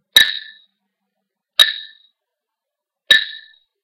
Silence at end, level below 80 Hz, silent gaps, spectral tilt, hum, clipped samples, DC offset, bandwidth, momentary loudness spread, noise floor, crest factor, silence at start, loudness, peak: 0.45 s; -60 dBFS; none; 2 dB/octave; none; 0.1%; under 0.1%; 17 kHz; 17 LU; -83 dBFS; 20 dB; 0.15 s; -13 LUFS; 0 dBFS